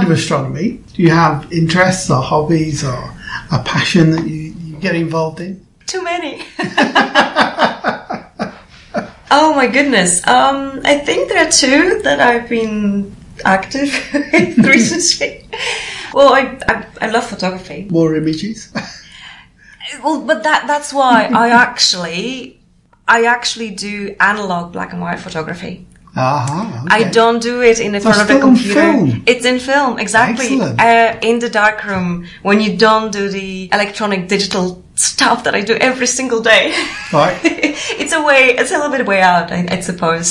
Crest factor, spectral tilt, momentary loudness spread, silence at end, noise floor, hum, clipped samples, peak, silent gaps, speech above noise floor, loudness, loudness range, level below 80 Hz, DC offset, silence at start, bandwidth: 14 dB; -4 dB/octave; 13 LU; 0 s; -51 dBFS; none; under 0.1%; 0 dBFS; none; 37 dB; -13 LUFS; 6 LU; -44 dBFS; under 0.1%; 0 s; 11.5 kHz